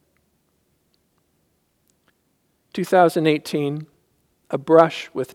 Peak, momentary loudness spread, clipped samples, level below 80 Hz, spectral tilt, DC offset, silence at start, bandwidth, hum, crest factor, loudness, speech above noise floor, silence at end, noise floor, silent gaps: 0 dBFS; 15 LU; under 0.1%; -72 dBFS; -6 dB/octave; under 0.1%; 2.75 s; 16.5 kHz; none; 22 dB; -19 LUFS; 49 dB; 0.1 s; -68 dBFS; none